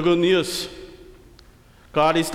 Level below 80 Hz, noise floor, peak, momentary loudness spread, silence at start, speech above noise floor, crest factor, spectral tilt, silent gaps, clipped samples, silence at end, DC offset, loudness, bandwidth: -50 dBFS; -50 dBFS; -8 dBFS; 21 LU; 0 s; 31 dB; 16 dB; -4.5 dB/octave; none; under 0.1%; 0 s; under 0.1%; -21 LUFS; 16 kHz